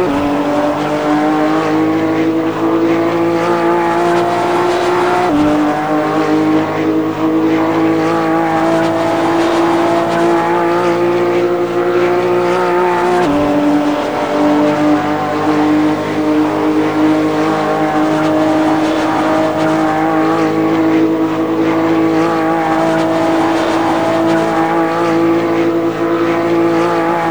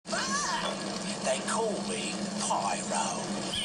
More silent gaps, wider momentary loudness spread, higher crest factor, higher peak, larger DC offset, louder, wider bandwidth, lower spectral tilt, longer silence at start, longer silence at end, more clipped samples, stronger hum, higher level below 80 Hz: neither; about the same, 2 LU vs 4 LU; about the same, 12 dB vs 14 dB; first, -2 dBFS vs -16 dBFS; first, 0.7% vs under 0.1%; first, -13 LUFS vs -31 LUFS; first, over 20 kHz vs 14 kHz; first, -6 dB/octave vs -2.5 dB/octave; about the same, 0 s vs 0.05 s; about the same, 0 s vs 0 s; neither; neither; first, -46 dBFS vs -62 dBFS